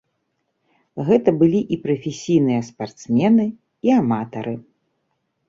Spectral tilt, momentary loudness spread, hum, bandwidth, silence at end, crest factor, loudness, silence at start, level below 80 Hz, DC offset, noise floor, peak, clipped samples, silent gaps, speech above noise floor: -7.5 dB/octave; 14 LU; none; 7.6 kHz; 0.9 s; 18 dB; -19 LUFS; 0.95 s; -60 dBFS; under 0.1%; -72 dBFS; -2 dBFS; under 0.1%; none; 54 dB